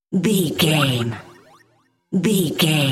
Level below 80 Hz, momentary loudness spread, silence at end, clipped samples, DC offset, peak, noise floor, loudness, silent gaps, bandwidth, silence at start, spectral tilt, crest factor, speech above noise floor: -58 dBFS; 9 LU; 0 s; under 0.1%; under 0.1%; -4 dBFS; -61 dBFS; -19 LUFS; none; 16.5 kHz; 0.1 s; -5 dB/octave; 16 dB; 43 dB